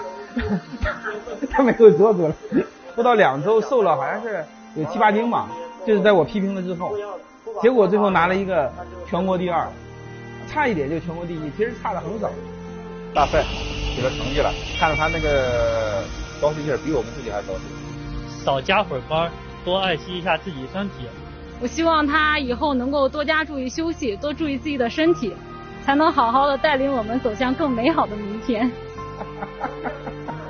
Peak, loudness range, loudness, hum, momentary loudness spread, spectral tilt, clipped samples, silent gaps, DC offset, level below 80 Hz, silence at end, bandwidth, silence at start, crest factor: 0 dBFS; 6 LU; -21 LUFS; none; 15 LU; -4 dB/octave; under 0.1%; none; under 0.1%; -38 dBFS; 0 s; 6.6 kHz; 0 s; 20 dB